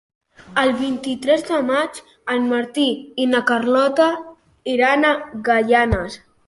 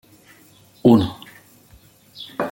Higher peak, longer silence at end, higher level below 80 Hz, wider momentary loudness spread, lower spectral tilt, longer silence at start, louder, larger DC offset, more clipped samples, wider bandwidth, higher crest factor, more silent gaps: about the same, -2 dBFS vs -2 dBFS; first, 0.3 s vs 0 s; first, -42 dBFS vs -56 dBFS; second, 9 LU vs 23 LU; second, -5 dB/octave vs -7.5 dB/octave; second, 0.45 s vs 0.85 s; about the same, -18 LUFS vs -18 LUFS; neither; neither; second, 11.5 kHz vs 17 kHz; about the same, 16 dB vs 20 dB; neither